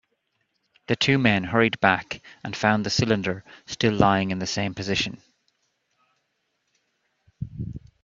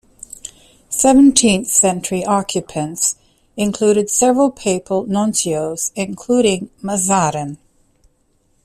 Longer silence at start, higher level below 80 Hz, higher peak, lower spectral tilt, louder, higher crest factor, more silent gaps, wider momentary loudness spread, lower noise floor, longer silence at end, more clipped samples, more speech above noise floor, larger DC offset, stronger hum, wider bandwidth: first, 0.9 s vs 0.45 s; second, -54 dBFS vs -48 dBFS; about the same, -2 dBFS vs 0 dBFS; about the same, -5 dB/octave vs -4 dB/octave; second, -23 LUFS vs -16 LUFS; first, 24 dB vs 18 dB; neither; about the same, 16 LU vs 17 LU; first, -75 dBFS vs -60 dBFS; second, 0.25 s vs 1.1 s; neither; first, 51 dB vs 44 dB; neither; neither; second, 7.6 kHz vs 15 kHz